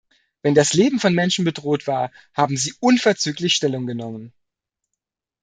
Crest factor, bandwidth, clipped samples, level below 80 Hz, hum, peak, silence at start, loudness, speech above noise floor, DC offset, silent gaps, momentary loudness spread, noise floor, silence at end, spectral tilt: 18 dB; 9.6 kHz; under 0.1%; -62 dBFS; none; -2 dBFS; 0.45 s; -19 LUFS; 63 dB; under 0.1%; none; 10 LU; -82 dBFS; 1.15 s; -4 dB/octave